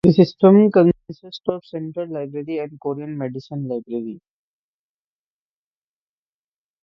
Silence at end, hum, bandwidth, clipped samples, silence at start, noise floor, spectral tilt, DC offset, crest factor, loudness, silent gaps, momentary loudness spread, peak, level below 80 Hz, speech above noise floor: 2.65 s; none; 6 kHz; under 0.1%; 0.05 s; under -90 dBFS; -9.5 dB/octave; under 0.1%; 20 dB; -20 LUFS; none; 17 LU; 0 dBFS; -58 dBFS; over 71 dB